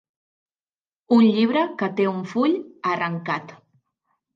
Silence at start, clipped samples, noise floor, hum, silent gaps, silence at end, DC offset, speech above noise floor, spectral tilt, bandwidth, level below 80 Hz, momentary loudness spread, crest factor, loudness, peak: 1.1 s; under 0.1%; under -90 dBFS; none; none; 0.8 s; under 0.1%; over 69 dB; -7.5 dB/octave; 7 kHz; -76 dBFS; 10 LU; 16 dB; -22 LUFS; -6 dBFS